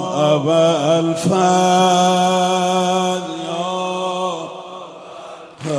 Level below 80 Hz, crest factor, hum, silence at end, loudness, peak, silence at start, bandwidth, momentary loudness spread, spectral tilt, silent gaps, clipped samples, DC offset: -60 dBFS; 14 dB; none; 0 s; -16 LUFS; -2 dBFS; 0 s; 11 kHz; 20 LU; -4.5 dB/octave; none; under 0.1%; under 0.1%